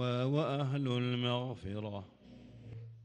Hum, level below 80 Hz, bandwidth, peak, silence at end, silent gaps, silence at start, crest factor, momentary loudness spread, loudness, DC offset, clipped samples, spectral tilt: none; -68 dBFS; 8.8 kHz; -20 dBFS; 0 s; none; 0 s; 16 dB; 21 LU; -35 LUFS; under 0.1%; under 0.1%; -7.5 dB/octave